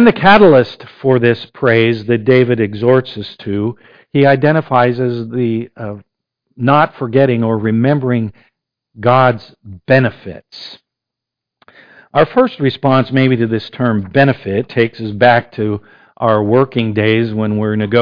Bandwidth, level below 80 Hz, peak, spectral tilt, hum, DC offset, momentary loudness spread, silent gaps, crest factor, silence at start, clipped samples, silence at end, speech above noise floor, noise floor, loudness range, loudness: 5.2 kHz; -48 dBFS; 0 dBFS; -9 dB/octave; none; under 0.1%; 11 LU; none; 14 dB; 0 s; under 0.1%; 0 s; 69 dB; -82 dBFS; 4 LU; -13 LUFS